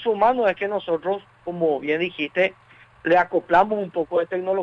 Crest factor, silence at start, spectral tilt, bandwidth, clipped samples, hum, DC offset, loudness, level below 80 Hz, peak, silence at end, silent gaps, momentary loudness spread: 16 dB; 0 s; -7 dB/octave; 7.2 kHz; under 0.1%; none; under 0.1%; -22 LUFS; -58 dBFS; -6 dBFS; 0 s; none; 7 LU